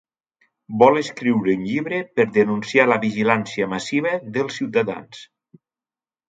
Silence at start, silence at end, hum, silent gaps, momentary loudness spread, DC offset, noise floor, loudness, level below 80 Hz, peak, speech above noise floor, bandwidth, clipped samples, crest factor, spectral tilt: 0.7 s; 1.05 s; none; none; 9 LU; under 0.1%; under -90 dBFS; -20 LUFS; -64 dBFS; 0 dBFS; over 70 dB; 9.2 kHz; under 0.1%; 20 dB; -6 dB/octave